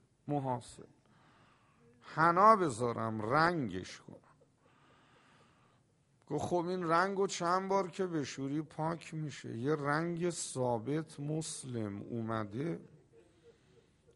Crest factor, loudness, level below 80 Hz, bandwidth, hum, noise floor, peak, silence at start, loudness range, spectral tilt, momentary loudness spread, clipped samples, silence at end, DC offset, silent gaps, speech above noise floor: 24 dB; -34 LUFS; -72 dBFS; 11.5 kHz; none; -71 dBFS; -12 dBFS; 0.25 s; 8 LU; -5.5 dB/octave; 12 LU; under 0.1%; 0.65 s; under 0.1%; none; 37 dB